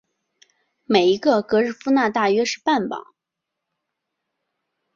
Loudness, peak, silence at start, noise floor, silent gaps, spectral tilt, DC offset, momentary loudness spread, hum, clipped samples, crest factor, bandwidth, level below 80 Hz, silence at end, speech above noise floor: -20 LUFS; -2 dBFS; 0.9 s; -83 dBFS; none; -4.5 dB/octave; under 0.1%; 5 LU; none; under 0.1%; 20 dB; 7.4 kHz; -66 dBFS; 1.95 s; 64 dB